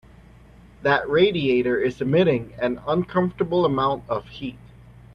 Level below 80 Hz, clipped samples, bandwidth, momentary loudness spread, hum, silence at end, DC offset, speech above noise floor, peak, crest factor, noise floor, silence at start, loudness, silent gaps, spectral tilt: -50 dBFS; under 0.1%; 6.6 kHz; 10 LU; none; 0.6 s; under 0.1%; 27 dB; -6 dBFS; 18 dB; -48 dBFS; 0.8 s; -22 LUFS; none; -8 dB/octave